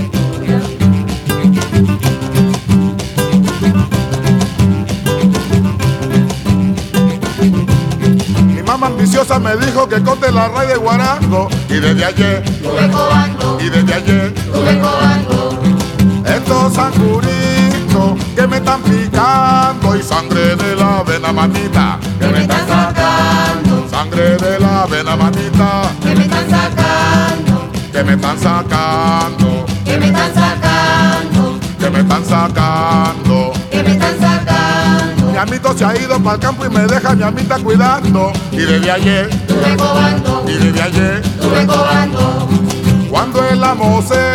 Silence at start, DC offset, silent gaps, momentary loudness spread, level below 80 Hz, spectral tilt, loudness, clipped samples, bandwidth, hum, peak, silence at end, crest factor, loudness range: 0 s; under 0.1%; none; 4 LU; -32 dBFS; -6 dB/octave; -12 LUFS; under 0.1%; 16 kHz; none; 0 dBFS; 0 s; 12 dB; 1 LU